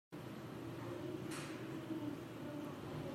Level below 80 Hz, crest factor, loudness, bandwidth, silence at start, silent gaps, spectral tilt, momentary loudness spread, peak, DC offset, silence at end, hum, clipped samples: -74 dBFS; 14 dB; -47 LUFS; 16 kHz; 0.1 s; none; -6 dB/octave; 4 LU; -32 dBFS; under 0.1%; 0 s; none; under 0.1%